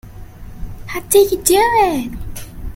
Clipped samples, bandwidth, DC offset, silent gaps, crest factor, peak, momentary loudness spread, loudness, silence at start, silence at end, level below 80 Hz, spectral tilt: under 0.1%; 17 kHz; under 0.1%; none; 16 dB; 0 dBFS; 21 LU; -14 LUFS; 0.05 s; 0 s; -32 dBFS; -3.5 dB/octave